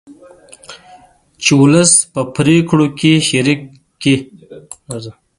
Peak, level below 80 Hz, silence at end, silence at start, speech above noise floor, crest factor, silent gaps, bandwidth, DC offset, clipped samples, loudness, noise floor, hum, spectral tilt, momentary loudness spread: 0 dBFS; -50 dBFS; 0.3 s; 0.1 s; 31 dB; 14 dB; none; 11.5 kHz; under 0.1%; under 0.1%; -12 LUFS; -44 dBFS; none; -4 dB/octave; 19 LU